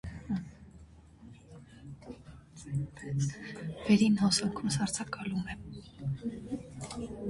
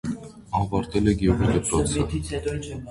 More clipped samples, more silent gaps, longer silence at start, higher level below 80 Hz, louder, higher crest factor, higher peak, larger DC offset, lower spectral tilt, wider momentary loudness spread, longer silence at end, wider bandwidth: neither; neither; about the same, 0.05 s vs 0.05 s; second, -56 dBFS vs -36 dBFS; second, -33 LUFS vs -24 LUFS; about the same, 20 dB vs 18 dB; second, -14 dBFS vs -6 dBFS; neither; about the same, -5 dB/octave vs -6 dB/octave; first, 25 LU vs 10 LU; about the same, 0 s vs 0 s; about the same, 11.5 kHz vs 11.5 kHz